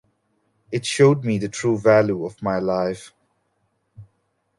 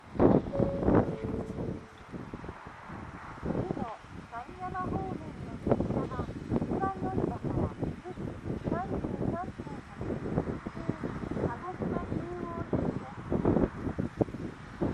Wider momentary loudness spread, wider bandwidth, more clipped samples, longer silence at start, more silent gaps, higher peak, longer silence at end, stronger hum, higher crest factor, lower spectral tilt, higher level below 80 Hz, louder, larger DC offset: second, 11 LU vs 15 LU; about the same, 11.5 kHz vs 10.5 kHz; neither; first, 0.7 s vs 0 s; neither; first, -2 dBFS vs -8 dBFS; first, 0.55 s vs 0 s; neither; about the same, 20 dB vs 24 dB; second, -6 dB/octave vs -9 dB/octave; second, -58 dBFS vs -46 dBFS; first, -20 LUFS vs -33 LUFS; neither